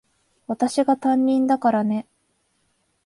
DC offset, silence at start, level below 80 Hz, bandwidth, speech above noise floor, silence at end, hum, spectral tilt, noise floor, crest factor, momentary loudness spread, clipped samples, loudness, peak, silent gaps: under 0.1%; 0.5 s; -68 dBFS; 11.5 kHz; 48 dB; 1.05 s; none; -6 dB/octave; -68 dBFS; 16 dB; 7 LU; under 0.1%; -21 LUFS; -8 dBFS; none